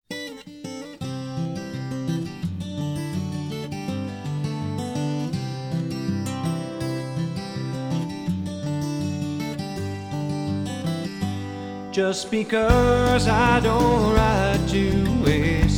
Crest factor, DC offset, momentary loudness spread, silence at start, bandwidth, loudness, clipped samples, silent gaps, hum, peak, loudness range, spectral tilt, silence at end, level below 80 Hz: 20 dB; under 0.1%; 12 LU; 0.1 s; 18.5 kHz; -24 LUFS; under 0.1%; none; none; -4 dBFS; 10 LU; -6 dB/octave; 0 s; -34 dBFS